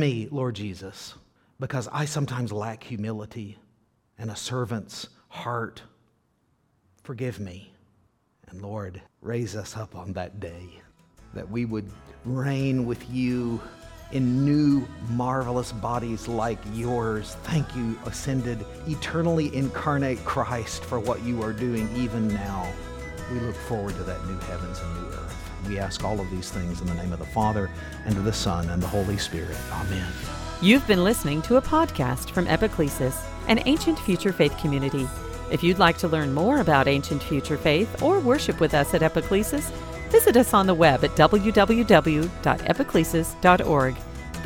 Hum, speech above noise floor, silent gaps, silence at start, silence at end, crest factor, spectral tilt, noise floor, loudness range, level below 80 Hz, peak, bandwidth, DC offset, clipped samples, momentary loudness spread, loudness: none; 44 dB; none; 0 s; 0 s; 24 dB; -5.5 dB/octave; -68 dBFS; 15 LU; -40 dBFS; 0 dBFS; 18 kHz; under 0.1%; under 0.1%; 17 LU; -25 LUFS